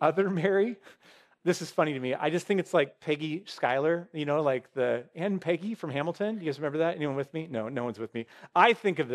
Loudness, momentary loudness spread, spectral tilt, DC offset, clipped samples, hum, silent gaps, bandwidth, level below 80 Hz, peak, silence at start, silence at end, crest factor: -29 LUFS; 8 LU; -6 dB/octave; under 0.1%; under 0.1%; none; none; 13.5 kHz; -80 dBFS; -6 dBFS; 0 s; 0 s; 24 dB